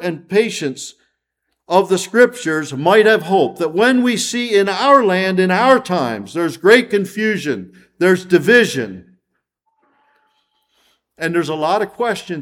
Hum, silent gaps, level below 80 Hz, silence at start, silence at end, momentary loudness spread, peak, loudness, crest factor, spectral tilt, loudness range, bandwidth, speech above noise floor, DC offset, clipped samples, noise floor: none; none; -64 dBFS; 0 s; 0 s; 10 LU; 0 dBFS; -15 LUFS; 16 dB; -4.5 dB/octave; 6 LU; 16.5 kHz; 58 dB; under 0.1%; under 0.1%; -73 dBFS